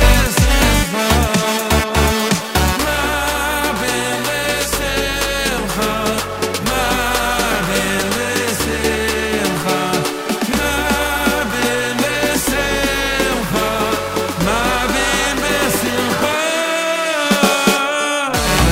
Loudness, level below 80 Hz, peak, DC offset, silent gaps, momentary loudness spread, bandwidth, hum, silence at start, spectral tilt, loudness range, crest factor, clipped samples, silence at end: -16 LUFS; -26 dBFS; 0 dBFS; under 0.1%; none; 4 LU; 16.5 kHz; none; 0 s; -3.5 dB/octave; 2 LU; 16 dB; under 0.1%; 0 s